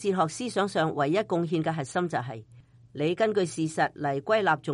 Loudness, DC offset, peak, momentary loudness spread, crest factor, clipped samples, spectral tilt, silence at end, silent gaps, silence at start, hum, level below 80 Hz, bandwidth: -27 LUFS; under 0.1%; -10 dBFS; 6 LU; 16 dB; under 0.1%; -5.5 dB/octave; 0 s; none; 0 s; none; -68 dBFS; 11.5 kHz